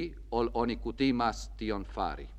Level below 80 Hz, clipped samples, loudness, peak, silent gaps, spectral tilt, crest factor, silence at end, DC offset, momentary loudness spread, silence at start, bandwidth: -44 dBFS; under 0.1%; -32 LUFS; -14 dBFS; none; -6 dB/octave; 18 dB; 0 s; under 0.1%; 8 LU; 0 s; 9.4 kHz